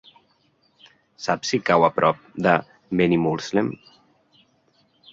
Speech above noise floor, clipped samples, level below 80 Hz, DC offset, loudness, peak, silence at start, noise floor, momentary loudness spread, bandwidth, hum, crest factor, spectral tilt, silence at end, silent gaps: 43 dB; under 0.1%; -58 dBFS; under 0.1%; -22 LUFS; -2 dBFS; 1.2 s; -64 dBFS; 10 LU; 7.8 kHz; none; 22 dB; -5.5 dB/octave; 1.4 s; none